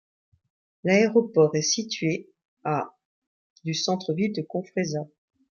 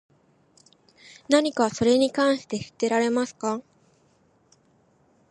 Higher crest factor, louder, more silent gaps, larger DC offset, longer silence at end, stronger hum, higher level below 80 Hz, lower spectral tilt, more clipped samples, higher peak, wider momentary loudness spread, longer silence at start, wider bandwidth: about the same, 20 dB vs 18 dB; about the same, -25 LUFS vs -24 LUFS; first, 2.45-2.57 s, 3.05-3.56 s vs none; neither; second, 0.5 s vs 1.7 s; neither; second, -72 dBFS vs -64 dBFS; about the same, -4.5 dB/octave vs -4 dB/octave; neither; about the same, -6 dBFS vs -8 dBFS; first, 13 LU vs 9 LU; second, 0.85 s vs 1.3 s; second, 7.2 kHz vs 11.5 kHz